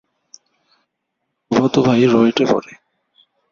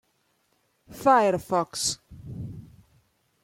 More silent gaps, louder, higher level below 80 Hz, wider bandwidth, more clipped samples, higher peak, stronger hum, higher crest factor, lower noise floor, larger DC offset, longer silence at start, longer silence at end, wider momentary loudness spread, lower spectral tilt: neither; first, -15 LUFS vs -24 LUFS; about the same, -56 dBFS vs -58 dBFS; second, 7.2 kHz vs 16.5 kHz; neither; first, -2 dBFS vs -6 dBFS; neither; about the same, 18 dB vs 22 dB; first, -75 dBFS vs -70 dBFS; neither; first, 1.5 s vs 0.9 s; about the same, 0.9 s vs 0.85 s; second, 6 LU vs 21 LU; first, -6.5 dB/octave vs -3.5 dB/octave